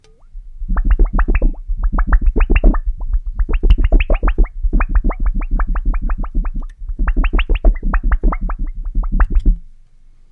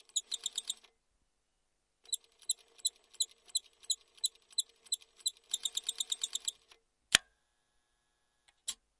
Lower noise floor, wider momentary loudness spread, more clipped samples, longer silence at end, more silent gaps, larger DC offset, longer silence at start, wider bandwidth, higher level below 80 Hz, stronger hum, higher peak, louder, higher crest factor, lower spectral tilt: second, -43 dBFS vs -80 dBFS; about the same, 9 LU vs 10 LU; neither; first, 0.6 s vs 0.25 s; neither; neither; first, 0.35 s vs 0.15 s; second, 3.3 kHz vs 11.5 kHz; first, -14 dBFS vs -76 dBFS; neither; first, 0 dBFS vs -4 dBFS; first, -20 LUFS vs -36 LUFS; second, 14 dB vs 36 dB; first, -9.5 dB/octave vs 2.5 dB/octave